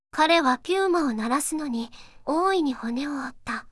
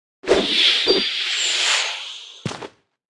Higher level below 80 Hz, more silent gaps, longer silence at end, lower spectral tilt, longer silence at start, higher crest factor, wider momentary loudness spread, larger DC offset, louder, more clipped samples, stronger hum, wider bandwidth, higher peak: second, -58 dBFS vs -52 dBFS; neither; second, 0.05 s vs 0.5 s; first, -3 dB/octave vs -1.5 dB/octave; about the same, 0.15 s vs 0.25 s; about the same, 18 dB vs 18 dB; second, 13 LU vs 17 LU; neither; second, -25 LUFS vs -17 LUFS; neither; neither; about the same, 12 kHz vs 12 kHz; second, -8 dBFS vs -2 dBFS